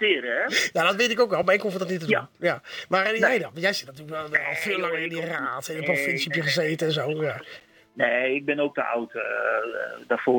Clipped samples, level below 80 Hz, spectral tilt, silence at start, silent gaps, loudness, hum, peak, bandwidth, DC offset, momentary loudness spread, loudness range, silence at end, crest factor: under 0.1%; -72 dBFS; -4 dB/octave; 0 s; none; -24 LUFS; none; -8 dBFS; 19 kHz; under 0.1%; 8 LU; 3 LU; 0 s; 18 dB